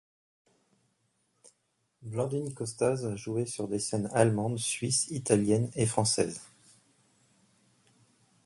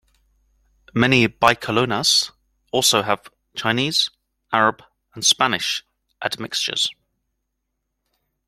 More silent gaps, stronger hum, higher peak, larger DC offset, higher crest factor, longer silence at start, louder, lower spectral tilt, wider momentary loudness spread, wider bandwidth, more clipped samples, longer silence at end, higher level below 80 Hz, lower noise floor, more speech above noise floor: neither; neither; second, -8 dBFS vs 0 dBFS; neither; about the same, 24 dB vs 22 dB; first, 2 s vs 0.95 s; second, -30 LUFS vs -19 LUFS; first, -4.5 dB/octave vs -2.5 dB/octave; second, 8 LU vs 11 LU; second, 11.5 kHz vs 16.5 kHz; neither; first, 2 s vs 1.55 s; second, -64 dBFS vs -56 dBFS; about the same, -76 dBFS vs -77 dBFS; second, 47 dB vs 57 dB